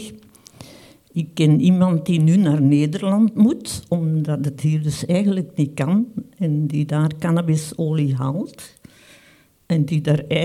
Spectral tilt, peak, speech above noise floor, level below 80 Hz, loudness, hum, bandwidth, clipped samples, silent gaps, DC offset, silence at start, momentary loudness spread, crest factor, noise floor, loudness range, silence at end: -7.5 dB/octave; -4 dBFS; 35 dB; -56 dBFS; -19 LUFS; none; 13.5 kHz; under 0.1%; none; under 0.1%; 0 s; 11 LU; 16 dB; -53 dBFS; 5 LU; 0 s